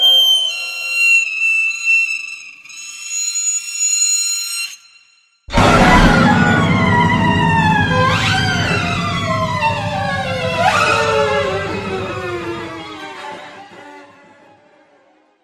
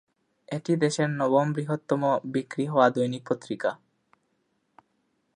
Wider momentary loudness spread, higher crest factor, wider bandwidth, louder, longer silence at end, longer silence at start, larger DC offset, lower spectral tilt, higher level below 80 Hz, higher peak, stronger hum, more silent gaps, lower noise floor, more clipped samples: first, 17 LU vs 9 LU; second, 16 dB vs 22 dB; first, 15.5 kHz vs 10.5 kHz; first, -14 LUFS vs -26 LUFS; second, 1.4 s vs 1.6 s; second, 0 s vs 0.5 s; neither; second, -3 dB/octave vs -6.5 dB/octave; first, -32 dBFS vs -76 dBFS; first, 0 dBFS vs -6 dBFS; neither; neither; second, -54 dBFS vs -73 dBFS; neither